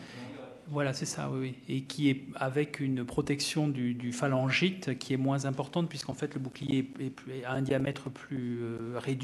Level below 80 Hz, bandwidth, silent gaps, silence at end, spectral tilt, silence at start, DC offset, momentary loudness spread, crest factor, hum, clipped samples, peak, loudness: -64 dBFS; 13 kHz; none; 0 s; -5.5 dB/octave; 0 s; under 0.1%; 9 LU; 18 dB; none; under 0.1%; -14 dBFS; -33 LUFS